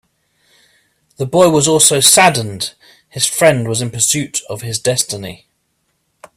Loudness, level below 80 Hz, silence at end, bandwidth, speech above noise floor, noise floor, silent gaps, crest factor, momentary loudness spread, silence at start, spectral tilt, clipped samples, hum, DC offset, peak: -12 LUFS; -52 dBFS; 1 s; over 20 kHz; 52 dB; -66 dBFS; none; 16 dB; 17 LU; 1.2 s; -2.5 dB/octave; under 0.1%; none; under 0.1%; 0 dBFS